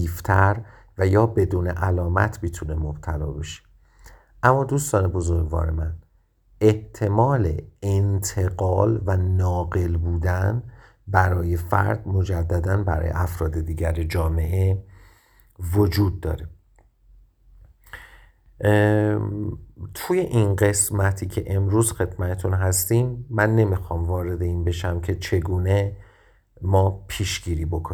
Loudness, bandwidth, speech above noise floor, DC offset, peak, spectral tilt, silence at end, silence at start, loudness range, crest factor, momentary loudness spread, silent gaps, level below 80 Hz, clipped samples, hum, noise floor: -23 LUFS; 18.5 kHz; 38 dB; under 0.1%; 0 dBFS; -6 dB/octave; 0 s; 0 s; 4 LU; 22 dB; 11 LU; none; -34 dBFS; under 0.1%; none; -59 dBFS